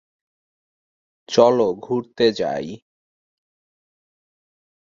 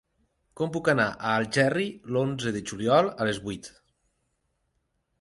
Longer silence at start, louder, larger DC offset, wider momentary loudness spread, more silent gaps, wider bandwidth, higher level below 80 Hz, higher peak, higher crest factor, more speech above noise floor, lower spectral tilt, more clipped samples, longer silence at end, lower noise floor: first, 1.3 s vs 0.6 s; first, -19 LUFS vs -26 LUFS; neither; about the same, 12 LU vs 10 LU; neither; second, 7.6 kHz vs 11.5 kHz; about the same, -62 dBFS vs -60 dBFS; first, 0 dBFS vs -8 dBFS; about the same, 22 dB vs 20 dB; first, over 71 dB vs 49 dB; about the same, -5 dB/octave vs -5.5 dB/octave; neither; first, 2.1 s vs 1.5 s; first, under -90 dBFS vs -75 dBFS